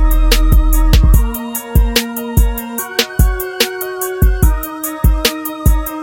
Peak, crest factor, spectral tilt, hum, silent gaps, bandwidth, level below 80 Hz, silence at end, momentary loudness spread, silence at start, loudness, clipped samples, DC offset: 0 dBFS; 12 dB; -4.5 dB/octave; none; none; 17.5 kHz; -14 dBFS; 0 s; 7 LU; 0 s; -15 LUFS; under 0.1%; under 0.1%